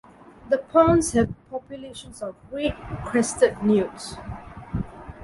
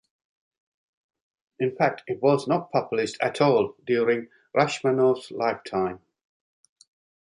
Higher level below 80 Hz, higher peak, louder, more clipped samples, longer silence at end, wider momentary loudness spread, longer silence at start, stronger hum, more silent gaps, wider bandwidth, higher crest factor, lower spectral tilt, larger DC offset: first, -44 dBFS vs -68 dBFS; about the same, -6 dBFS vs -6 dBFS; about the same, -23 LUFS vs -25 LUFS; neither; second, 0 s vs 1.35 s; first, 19 LU vs 7 LU; second, 0.45 s vs 1.6 s; neither; neither; about the same, 11.5 kHz vs 11 kHz; about the same, 20 dB vs 20 dB; about the same, -5.5 dB/octave vs -6 dB/octave; neither